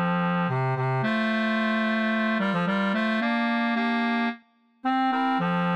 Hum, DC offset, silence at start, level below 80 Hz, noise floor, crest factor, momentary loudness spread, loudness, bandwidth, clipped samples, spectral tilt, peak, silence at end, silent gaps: none; under 0.1%; 0 s; -78 dBFS; -54 dBFS; 10 dB; 2 LU; -25 LUFS; 8.6 kHz; under 0.1%; -7.5 dB/octave; -14 dBFS; 0 s; none